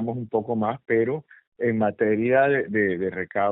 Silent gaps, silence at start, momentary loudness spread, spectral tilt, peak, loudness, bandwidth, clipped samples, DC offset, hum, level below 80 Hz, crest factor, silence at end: 1.47-1.52 s; 0 s; 8 LU; -6.5 dB/octave; -8 dBFS; -24 LUFS; 4 kHz; under 0.1%; under 0.1%; none; -66 dBFS; 16 dB; 0 s